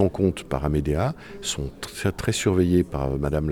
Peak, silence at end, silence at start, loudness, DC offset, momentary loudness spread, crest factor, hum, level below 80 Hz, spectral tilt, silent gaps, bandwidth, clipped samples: -8 dBFS; 0 s; 0 s; -25 LUFS; under 0.1%; 8 LU; 16 dB; none; -38 dBFS; -6 dB/octave; none; 18.5 kHz; under 0.1%